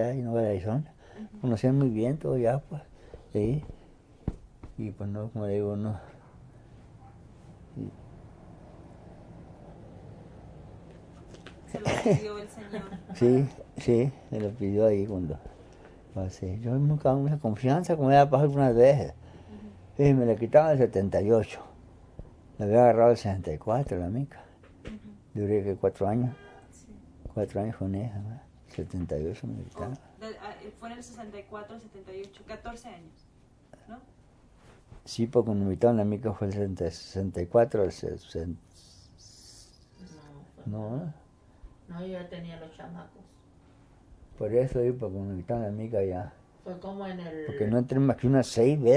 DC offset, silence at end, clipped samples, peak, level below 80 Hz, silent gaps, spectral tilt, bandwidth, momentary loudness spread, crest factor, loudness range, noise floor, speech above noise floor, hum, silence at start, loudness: under 0.1%; 0 s; under 0.1%; -8 dBFS; -52 dBFS; none; -8 dB/octave; 11 kHz; 24 LU; 22 dB; 20 LU; -57 dBFS; 30 dB; none; 0 s; -28 LUFS